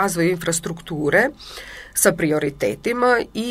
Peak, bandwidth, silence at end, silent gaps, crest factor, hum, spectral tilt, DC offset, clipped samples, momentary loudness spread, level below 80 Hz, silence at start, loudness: -2 dBFS; 16 kHz; 0 s; none; 20 dB; none; -4 dB/octave; under 0.1%; under 0.1%; 11 LU; -48 dBFS; 0 s; -20 LUFS